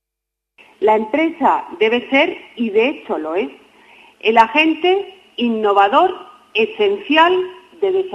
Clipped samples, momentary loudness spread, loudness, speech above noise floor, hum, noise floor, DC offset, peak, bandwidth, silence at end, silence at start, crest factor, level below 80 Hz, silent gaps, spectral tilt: under 0.1%; 10 LU; -16 LUFS; 66 dB; none; -81 dBFS; under 0.1%; 0 dBFS; 9 kHz; 0 s; 0.8 s; 16 dB; -62 dBFS; none; -5 dB/octave